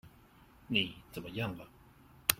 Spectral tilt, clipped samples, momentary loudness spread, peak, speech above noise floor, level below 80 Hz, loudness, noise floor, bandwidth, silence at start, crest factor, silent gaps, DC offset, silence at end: -2.5 dB/octave; under 0.1%; 16 LU; -4 dBFS; 23 dB; -62 dBFS; -36 LUFS; -61 dBFS; 16.5 kHz; 0.05 s; 34 dB; none; under 0.1%; 0 s